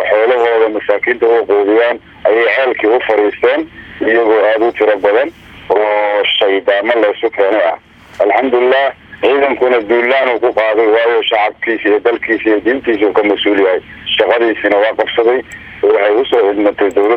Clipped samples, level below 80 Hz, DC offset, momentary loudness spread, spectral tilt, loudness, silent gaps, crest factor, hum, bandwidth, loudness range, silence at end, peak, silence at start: under 0.1%; -50 dBFS; under 0.1%; 5 LU; -5 dB/octave; -12 LUFS; none; 12 dB; none; 8.2 kHz; 1 LU; 0 s; 0 dBFS; 0 s